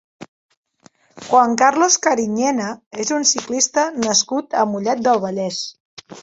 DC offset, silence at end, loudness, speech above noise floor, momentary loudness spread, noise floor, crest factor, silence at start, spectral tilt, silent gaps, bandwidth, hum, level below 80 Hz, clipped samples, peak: under 0.1%; 0 s; -17 LUFS; 36 dB; 10 LU; -53 dBFS; 18 dB; 0.2 s; -2 dB/octave; 0.28-0.49 s, 0.57-0.63 s, 2.86-2.91 s, 5.80-5.97 s; 8.2 kHz; none; -64 dBFS; under 0.1%; -2 dBFS